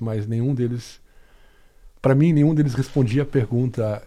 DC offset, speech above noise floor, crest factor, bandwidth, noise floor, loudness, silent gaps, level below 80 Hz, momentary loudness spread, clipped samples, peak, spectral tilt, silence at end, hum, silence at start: under 0.1%; 31 dB; 14 dB; 11.5 kHz; -51 dBFS; -21 LUFS; none; -46 dBFS; 9 LU; under 0.1%; -6 dBFS; -8.5 dB/octave; 0 s; none; 0 s